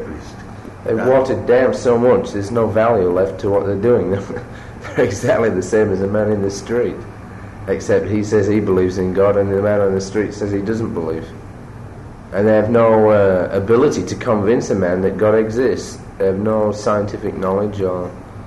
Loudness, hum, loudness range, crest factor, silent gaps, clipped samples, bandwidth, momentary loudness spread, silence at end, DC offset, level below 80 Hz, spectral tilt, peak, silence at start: -16 LUFS; none; 4 LU; 12 dB; none; under 0.1%; 12 kHz; 17 LU; 0 s; under 0.1%; -42 dBFS; -7 dB/octave; -4 dBFS; 0 s